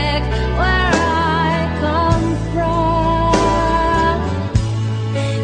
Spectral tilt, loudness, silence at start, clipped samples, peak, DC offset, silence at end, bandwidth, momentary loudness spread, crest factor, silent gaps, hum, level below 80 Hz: -6 dB/octave; -17 LUFS; 0 s; under 0.1%; -2 dBFS; under 0.1%; 0 s; 9.8 kHz; 5 LU; 14 dB; none; none; -24 dBFS